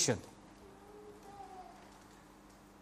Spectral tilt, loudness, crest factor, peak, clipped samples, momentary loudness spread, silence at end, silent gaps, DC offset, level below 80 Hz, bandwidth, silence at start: -3 dB/octave; -44 LUFS; 26 dB; -18 dBFS; under 0.1%; 16 LU; 0 s; none; under 0.1%; -68 dBFS; 15 kHz; 0 s